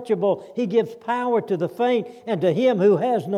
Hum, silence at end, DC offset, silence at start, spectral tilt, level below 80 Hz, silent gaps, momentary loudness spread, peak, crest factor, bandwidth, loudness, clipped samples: none; 0 s; under 0.1%; 0 s; -7.5 dB/octave; -76 dBFS; none; 7 LU; -8 dBFS; 14 dB; 13 kHz; -22 LUFS; under 0.1%